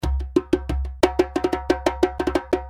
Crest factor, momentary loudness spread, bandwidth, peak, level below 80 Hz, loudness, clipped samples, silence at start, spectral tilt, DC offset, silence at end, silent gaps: 22 dB; 4 LU; 15.5 kHz; 0 dBFS; -30 dBFS; -23 LUFS; under 0.1%; 0 s; -6.5 dB/octave; under 0.1%; 0 s; none